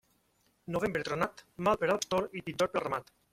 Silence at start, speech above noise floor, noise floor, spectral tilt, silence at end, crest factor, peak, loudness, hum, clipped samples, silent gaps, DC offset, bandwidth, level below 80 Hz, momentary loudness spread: 0.7 s; 40 dB; -72 dBFS; -4.5 dB/octave; 0.3 s; 20 dB; -14 dBFS; -33 LUFS; none; under 0.1%; none; under 0.1%; 16.5 kHz; -62 dBFS; 8 LU